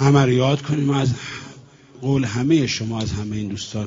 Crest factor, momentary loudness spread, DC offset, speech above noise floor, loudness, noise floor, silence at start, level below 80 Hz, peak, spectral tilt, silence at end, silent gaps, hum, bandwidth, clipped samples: 18 dB; 13 LU; under 0.1%; 25 dB; -21 LUFS; -44 dBFS; 0 s; -46 dBFS; -2 dBFS; -6 dB/octave; 0 s; none; none; 7.6 kHz; under 0.1%